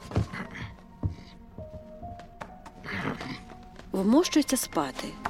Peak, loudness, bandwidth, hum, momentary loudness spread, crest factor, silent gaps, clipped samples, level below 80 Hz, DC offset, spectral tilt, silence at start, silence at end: -10 dBFS; -29 LUFS; 16.5 kHz; none; 21 LU; 20 dB; none; under 0.1%; -48 dBFS; under 0.1%; -5 dB/octave; 0 s; 0 s